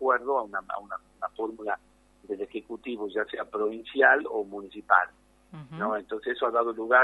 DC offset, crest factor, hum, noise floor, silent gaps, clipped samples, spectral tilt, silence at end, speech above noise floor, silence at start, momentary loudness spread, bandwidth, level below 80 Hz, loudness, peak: under 0.1%; 24 dB; 50 Hz at -65 dBFS; -59 dBFS; none; under 0.1%; -6 dB/octave; 0 s; 32 dB; 0 s; 15 LU; 11.5 kHz; -66 dBFS; -28 LUFS; -6 dBFS